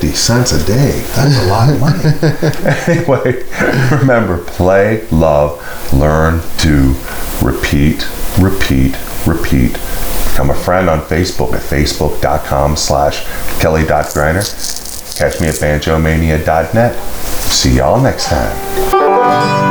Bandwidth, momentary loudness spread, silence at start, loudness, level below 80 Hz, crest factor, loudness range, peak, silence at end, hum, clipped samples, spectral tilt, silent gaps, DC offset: over 20 kHz; 7 LU; 0 s; -12 LUFS; -22 dBFS; 12 dB; 2 LU; 0 dBFS; 0 s; none; under 0.1%; -5 dB/octave; none; under 0.1%